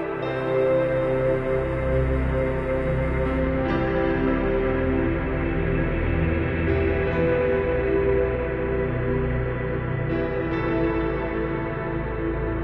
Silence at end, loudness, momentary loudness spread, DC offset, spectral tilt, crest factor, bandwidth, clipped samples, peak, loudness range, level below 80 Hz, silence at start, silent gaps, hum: 0 s; -24 LUFS; 5 LU; under 0.1%; -9.5 dB/octave; 14 dB; 5.6 kHz; under 0.1%; -10 dBFS; 2 LU; -32 dBFS; 0 s; none; none